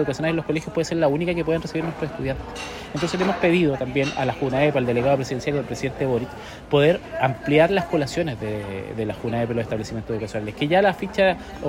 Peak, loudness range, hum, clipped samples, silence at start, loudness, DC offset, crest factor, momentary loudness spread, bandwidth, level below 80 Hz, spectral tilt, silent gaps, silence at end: -4 dBFS; 3 LU; none; under 0.1%; 0 s; -23 LUFS; under 0.1%; 18 dB; 10 LU; 16 kHz; -46 dBFS; -6 dB/octave; none; 0 s